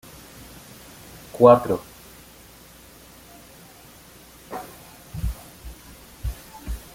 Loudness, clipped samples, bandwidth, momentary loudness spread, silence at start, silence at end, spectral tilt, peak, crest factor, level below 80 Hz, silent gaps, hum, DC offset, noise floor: -21 LUFS; under 0.1%; 17 kHz; 29 LU; 1.35 s; 0.15 s; -6.5 dB/octave; -2 dBFS; 24 dB; -40 dBFS; none; none; under 0.1%; -48 dBFS